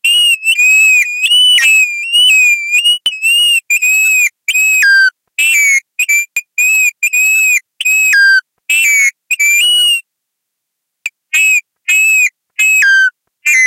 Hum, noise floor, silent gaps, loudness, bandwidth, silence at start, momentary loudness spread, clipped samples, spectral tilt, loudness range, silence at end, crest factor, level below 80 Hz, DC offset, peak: none; -74 dBFS; none; -8 LUFS; 16.5 kHz; 0.05 s; 7 LU; under 0.1%; 8 dB/octave; 4 LU; 0 s; 10 dB; -74 dBFS; under 0.1%; 0 dBFS